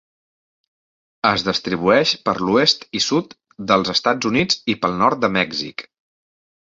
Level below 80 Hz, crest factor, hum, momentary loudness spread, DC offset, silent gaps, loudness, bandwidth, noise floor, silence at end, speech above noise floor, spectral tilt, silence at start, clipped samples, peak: -54 dBFS; 18 dB; none; 7 LU; under 0.1%; none; -18 LUFS; 7.8 kHz; under -90 dBFS; 0.9 s; over 71 dB; -4 dB/octave; 1.25 s; under 0.1%; -2 dBFS